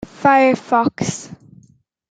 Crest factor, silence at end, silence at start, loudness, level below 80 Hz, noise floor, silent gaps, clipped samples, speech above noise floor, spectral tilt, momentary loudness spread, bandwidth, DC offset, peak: 16 dB; 0.75 s; 0 s; -16 LUFS; -56 dBFS; -54 dBFS; none; under 0.1%; 38 dB; -5 dB/octave; 17 LU; 9.4 kHz; under 0.1%; -2 dBFS